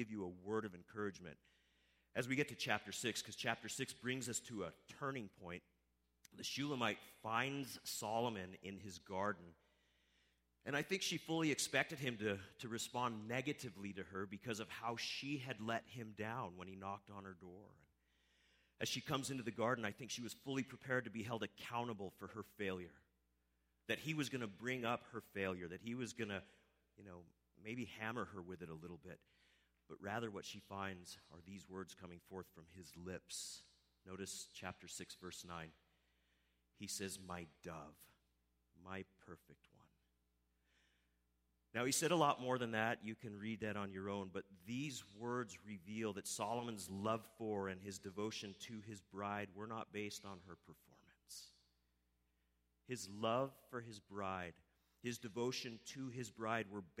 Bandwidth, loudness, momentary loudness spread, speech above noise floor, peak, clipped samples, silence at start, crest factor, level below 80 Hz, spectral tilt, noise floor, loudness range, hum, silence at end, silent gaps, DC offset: 16 kHz; -45 LUFS; 15 LU; 37 dB; -20 dBFS; under 0.1%; 0 s; 26 dB; -80 dBFS; -4 dB/octave; -83 dBFS; 11 LU; 60 Hz at -80 dBFS; 0 s; none; under 0.1%